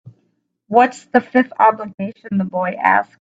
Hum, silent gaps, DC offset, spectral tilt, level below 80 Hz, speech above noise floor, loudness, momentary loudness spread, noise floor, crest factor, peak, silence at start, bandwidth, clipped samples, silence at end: none; 1.94-1.98 s; under 0.1%; -7 dB/octave; -64 dBFS; 50 dB; -17 LUFS; 9 LU; -66 dBFS; 18 dB; 0 dBFS; 0.05 s; 8 kHz; under 0.1%; 0.25 s